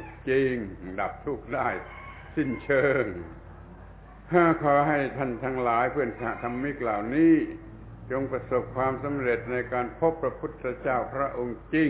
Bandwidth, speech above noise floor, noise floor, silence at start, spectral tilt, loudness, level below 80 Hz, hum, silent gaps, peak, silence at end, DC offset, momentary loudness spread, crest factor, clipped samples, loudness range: 4 kHz; 20 dB; -46 dBFS; 0 s; -11 dB/octave; -27 LUFS; -50 dBFS; none; none; -6 dBFS; 0 s; under 0.1%; 14 LU; 20 dB; under 0.1%; 4 LU